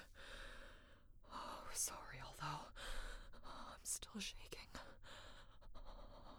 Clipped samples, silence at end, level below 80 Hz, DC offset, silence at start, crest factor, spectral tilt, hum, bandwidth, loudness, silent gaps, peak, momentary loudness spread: under 0.1%; 0 s; -58 dBFS; under 0.1%; 0 s; 22 dB; -1.5 dB/octave; none; over 20 kHz; -51 LUFS; none; -30 dBFS; 18 LU